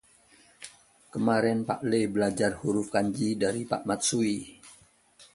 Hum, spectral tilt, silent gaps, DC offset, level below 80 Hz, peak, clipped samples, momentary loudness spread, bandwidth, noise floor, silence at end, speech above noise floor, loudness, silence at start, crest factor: none; -4.5 dB/octave; none; under 0.1%; -62 dBFS; -10 dBFS; under 0.1%; 20 LU; 11.5 kHz; -59 dBFS; 0.1 s; 32 dB; -28 LUFS; 0.6 s; 18 dB